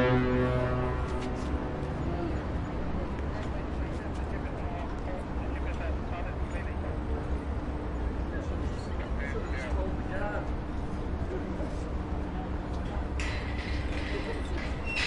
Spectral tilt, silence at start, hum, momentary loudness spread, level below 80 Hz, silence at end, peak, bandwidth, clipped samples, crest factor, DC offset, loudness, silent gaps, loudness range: -7 dB/octave; 0 s; none; 4 LU; -36 dBFS; 0 s; -14 dBFS; 10.5 kHz; under 0.1%; 16 dB; under 0.1%; -34 LUFS; none; 2 LU